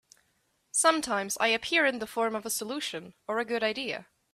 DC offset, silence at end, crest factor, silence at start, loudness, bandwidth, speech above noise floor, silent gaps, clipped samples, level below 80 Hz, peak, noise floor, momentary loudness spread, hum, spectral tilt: under 0.1%; 0.3 s; 20 dB; 0.75 s; -28 LUFS; 16 kHz; 43 dB; none; under 0.1%; -70 dBFS; -10 dBFS; -73 dBFS; 11 LU; none; -1.5 dB/octave